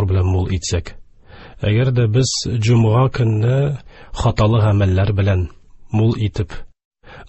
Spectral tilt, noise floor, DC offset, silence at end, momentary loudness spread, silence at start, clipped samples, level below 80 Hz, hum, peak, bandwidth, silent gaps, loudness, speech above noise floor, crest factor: -6.5 dB/octave; -41 dBFS; under 0.1%; 0.05 s; 10 LU; 0 s; under 0.1%; -30 dBFS; none; -2 dBFS; 8.4 kHz; 6.85-6.91 s; -17 LUFS; 25 dB; 14 dB